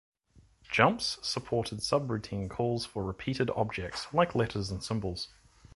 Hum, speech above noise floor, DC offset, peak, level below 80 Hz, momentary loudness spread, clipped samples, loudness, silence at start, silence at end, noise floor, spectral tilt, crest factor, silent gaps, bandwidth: none; 32 dB; under 0.1%; -6 dBFS; -54 dBFS; 10 LU; under 0.1%; -31 LUFS; 0.7 s; 0.5 s; -63 dBFS; -5 dB/octave; 26 dB; none; 11.5 kHz